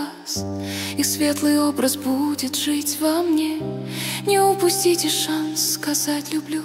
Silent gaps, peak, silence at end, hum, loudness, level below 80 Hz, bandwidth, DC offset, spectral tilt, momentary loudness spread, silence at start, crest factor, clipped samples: none; -6 dBFS; 0 s; none; -21 LUFS; -60 dBFS; 16.5 kHz; under 0.1%; -3 dB/octave; 9 LU; 0 s; 16 dB; under 0.1%